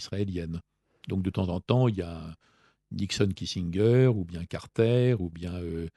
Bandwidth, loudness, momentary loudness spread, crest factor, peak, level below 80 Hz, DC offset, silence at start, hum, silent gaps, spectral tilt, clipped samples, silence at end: 11.5 kHz; -28 LUFS; 15 LU; 22 dB; -6 dBFS; -52 dBFS; under 0.1%; 0 s; none; none; -7 dB/octave; under 0.1%; 0.05 s